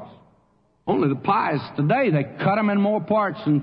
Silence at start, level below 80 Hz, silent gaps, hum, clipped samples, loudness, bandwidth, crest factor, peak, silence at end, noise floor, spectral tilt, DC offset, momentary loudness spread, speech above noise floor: 0 s; -64 dBFS; none; none; under 0.1%; -22 LUFS; 5.4 kHz; 14 dB; -8 dBFS; 0 s; -62 dBFS; -10.5 dB/octave; under 0.1%; 4 LU; 42 dB